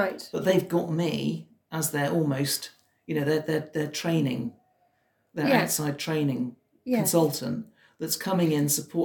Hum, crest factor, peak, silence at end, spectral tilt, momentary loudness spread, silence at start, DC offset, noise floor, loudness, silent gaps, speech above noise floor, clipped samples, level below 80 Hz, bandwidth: none; 20 dB; -8 dBFS; 0 s; -4.5 dB/octave; 13 LU; 0 s; under 0.1%; -70 dBFS; -27 LUFS; none; 44 dB; under 0.1%; -72 dBFS; 17 kHz